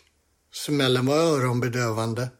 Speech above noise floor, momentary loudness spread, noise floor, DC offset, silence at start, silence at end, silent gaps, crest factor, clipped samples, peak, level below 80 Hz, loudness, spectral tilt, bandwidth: 43 dB; 9 LU; -66 dBFS; under 0.1%; 0.55 s; 0.1 s; none; 16 dB; under 0.1%; -8 dBFS; -62 dBFS; -23 LUFS; -5.5 dB/octave; 16 kHz